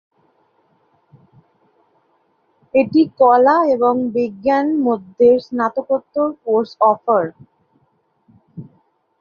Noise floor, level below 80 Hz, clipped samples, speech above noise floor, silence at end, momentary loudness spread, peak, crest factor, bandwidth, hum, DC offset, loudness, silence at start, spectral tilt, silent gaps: -63 dBFS; -62 dBFS; under 0.1%; 47 dB; 0.55 s; 9 LU; -2 dBFS; 16 dB; 6.6 kHz; none; under 0.1%; -16 LUFS; 2.75 s; -8 dB/octave; none